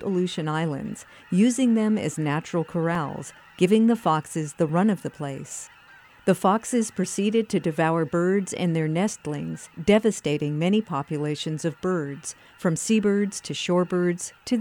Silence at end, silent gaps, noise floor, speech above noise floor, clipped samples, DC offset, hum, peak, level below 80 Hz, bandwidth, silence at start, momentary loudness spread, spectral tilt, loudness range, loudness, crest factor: 0 s; none; -51 dBFS; 27 dB; under 0.1%; under 0.1%; none; -6 dBFS; -62 dBFS; 19 kHz; 0 s; 12 LU; -5.5 dB/octave; 2 LU; -24 LUFS; 18 dB